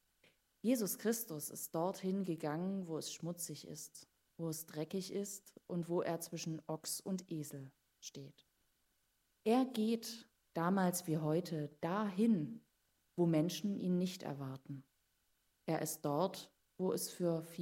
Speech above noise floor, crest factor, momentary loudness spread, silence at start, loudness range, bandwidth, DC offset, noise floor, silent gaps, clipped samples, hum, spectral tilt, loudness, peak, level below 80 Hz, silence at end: 41 dB; 18 dB; 17 LU; 0.65 s; 6 LU; 16 kHz; under 0.1%; -80 dBFS; none; under 0.1%; none; -5.5 dB/octave; -39 LUFS; -22 dBFS; -84 dBFS; 0 s